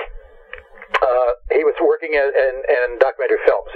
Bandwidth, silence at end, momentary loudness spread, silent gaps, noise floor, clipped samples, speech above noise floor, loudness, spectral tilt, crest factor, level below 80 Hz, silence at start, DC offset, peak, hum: 6.4 kHz; 0 s; 17 LU; none; -40 dBFS; under 0.1%; 22 dB; -17 LUFS; -5 dB/octave; 16 dB; -42 dBFS; 0 s; under 0.1%; -2 dBFS; none